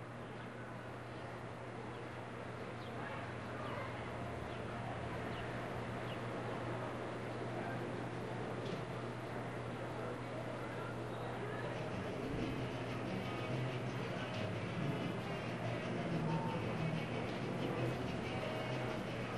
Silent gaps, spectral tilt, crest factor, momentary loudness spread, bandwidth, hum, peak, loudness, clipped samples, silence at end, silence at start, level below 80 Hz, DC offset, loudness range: none; -6.5 dB/octave; 16 dB; 7 LU; 13 kHz; none; -26 dBFS; -42 LUFS; under 0.1%; 0 s; 0 s; -62 dBFS; under 0.1%; 5 LU